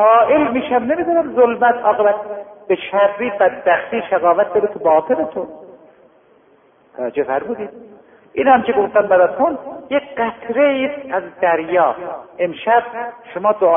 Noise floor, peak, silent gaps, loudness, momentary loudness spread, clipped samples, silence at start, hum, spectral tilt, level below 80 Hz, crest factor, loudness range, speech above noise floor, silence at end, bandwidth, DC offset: -52 dBFS; 0 dBFS; none; -16 LUFS; 14 LU; under 0.1%; 0 s; none; -10 dB/octave; -58 dBFS; 16 dB; 5 LU; 36 dB; 0 s; 3.7 kHz; under 0.1%